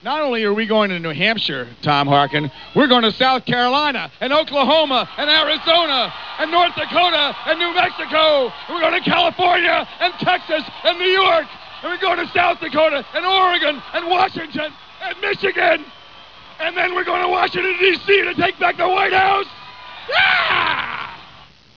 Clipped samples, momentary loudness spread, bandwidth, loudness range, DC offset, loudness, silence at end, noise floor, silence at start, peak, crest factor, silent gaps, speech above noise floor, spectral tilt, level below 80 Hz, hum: under 0.1%; 9 LU; 5.4 kHz; 3 LU; 0.4%; -17 LUFS; 0.45 s; -45 dBFS; 0.05 s; -2 dBFS; 16 dB; none; 28 dB; -5.5 dB/octave; -56 dBFS; none